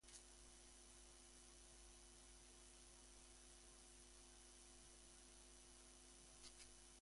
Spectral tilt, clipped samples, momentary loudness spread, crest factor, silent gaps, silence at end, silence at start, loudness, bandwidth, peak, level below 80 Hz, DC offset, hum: -2 dB/octave; under 0.1%; 2 LU; 20 dB; none; 0 s; 0 s; -64 LUFS; 11.5 kHz; -46 dBFS; -72 dBFS; under 0.1%; none